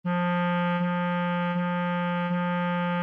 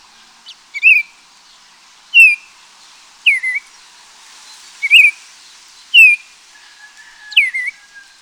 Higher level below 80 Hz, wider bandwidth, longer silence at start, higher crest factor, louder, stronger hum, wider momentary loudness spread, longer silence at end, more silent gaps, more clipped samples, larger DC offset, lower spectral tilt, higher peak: second, -80 dBFS vs -70 dBFS; second, 3.9 kHz vs over 20 kHz; second, 0.05 s vs 0.5 s; second, 8 dB vs 16 dB; second, -27 LUFS vs -9 LUFS; neither; second, 2 LU vs 17 LU; second, 0 s vs 0.5 s; neither; neither; neither; first, -9.5 dB/octave vs 5 dB/octave; second, -18 dBFS vs 0 dBFS